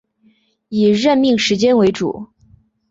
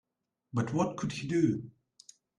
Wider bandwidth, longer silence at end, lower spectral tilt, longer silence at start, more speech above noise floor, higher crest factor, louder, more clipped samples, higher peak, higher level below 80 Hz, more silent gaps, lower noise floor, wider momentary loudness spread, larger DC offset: second, 8 kHz vs 11 kHz; about the same, 0.65 s vs 0.7 s; second, -5 dB/octave vs -6.5 dB/octave; first, 0.7 s vs 0.55 s; about the same, 43 dB vs 46 dB; about the same, 14 dB vs 18 dB; first, -15 LUFS vs -32 LUFS; neither; first, -4 dBFS vs -14 dBFS; first, -54 dBFS vs -66 dBFS; neither; second, -57 dBFS vs -77 dBFS; about the same, 11 LU vs 9 LU; neither